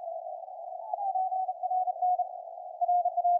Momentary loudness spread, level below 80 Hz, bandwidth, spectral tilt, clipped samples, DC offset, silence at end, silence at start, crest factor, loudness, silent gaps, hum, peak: 14 LU; under -90 dBFS; 1 kHz; -2 dB/octave; under 0.1%; under 0.1%; 0 s; 0 s; 12 dB; -31 LUFS; none; none; -18 dBFS